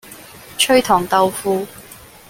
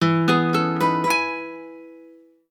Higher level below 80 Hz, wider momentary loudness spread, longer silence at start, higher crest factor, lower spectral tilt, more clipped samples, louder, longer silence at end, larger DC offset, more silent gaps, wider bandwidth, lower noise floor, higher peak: first, -52 dBFS vs -72 dBFS; first, 23 LU vs 18 LU; about the same, 0.05 s vs 0 s; about the same, 16 dB vs 18 dB; second, -3 dB/octave vs -5.5 dB/octave; neither; first, -16 LUFS vs -20 LUFS; second, 0.35 s vs 0.5 s; neither; neither; about the same, 17 kHz vs 17 kHz; second, -39 dBFS vs -49 dBFS; about the same, -2 dBFS vs -4 dBFS